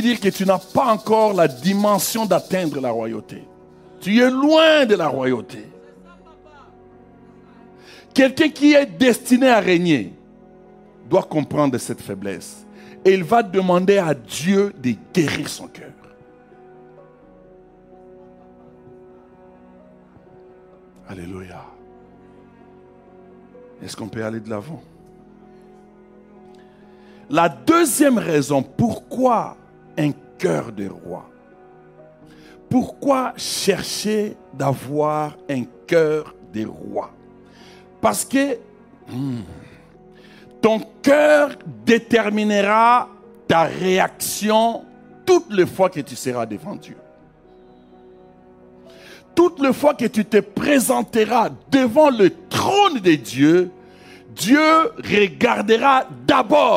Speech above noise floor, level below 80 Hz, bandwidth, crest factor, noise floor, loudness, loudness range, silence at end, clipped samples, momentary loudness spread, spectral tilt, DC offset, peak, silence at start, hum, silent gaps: 31 dB; -58 dBFS; 16 kHz; 16 dB; -48 dBFS; -18 LUFS; 13 LU; 0 s; under 0.1%; 17 LU; -5 dB/octave; under 0.1%; -4 dBFS; 0 s; none; none